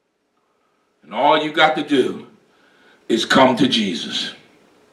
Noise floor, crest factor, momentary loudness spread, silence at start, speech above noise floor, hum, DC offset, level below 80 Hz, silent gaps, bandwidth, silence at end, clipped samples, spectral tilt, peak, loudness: -67 dBFS; 20 dB; 11 LU; 1.1 s; 50 dB; none; under 0.1%; -66 dBFS; none; 13.5 kHz; 0.55 s; under 0.1%; -4 dB/octave; 0 dBFS; -17 LUFS